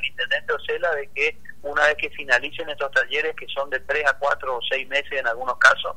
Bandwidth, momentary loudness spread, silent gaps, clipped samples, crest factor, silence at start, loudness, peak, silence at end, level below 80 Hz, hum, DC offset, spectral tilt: 16 kHz; 8 LU; none; under 0.1%; 22 dB; 0 s; -22 LUFS; 0 dBFS; 0.05 s; -56 dBFS; none; 2%; -1.5 dB/octave